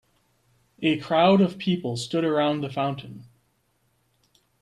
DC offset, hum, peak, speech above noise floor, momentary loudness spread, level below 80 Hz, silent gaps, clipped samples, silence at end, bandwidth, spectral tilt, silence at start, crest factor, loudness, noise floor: under 0.1%; none; -6 dBFS; 46 dB; 10 LU; -66 dBFS; none; under 0.1%; 1.4 s; 12 kHz; -6.5 dB/octave; 0.8 s; 20 dB; -23 LUFS; -69 dBFS